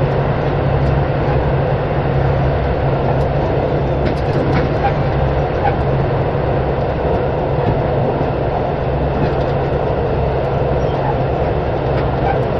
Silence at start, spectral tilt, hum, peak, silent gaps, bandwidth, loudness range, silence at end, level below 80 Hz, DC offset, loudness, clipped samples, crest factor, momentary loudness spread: 0 s; -9.5 dB/octave; none; -2 dBFS; none; 6 kHz; 1 LU; 0 s; -24 dBFS; under 0.1%; -17 LUFS; under 0.1%; 14 dB; 2 LU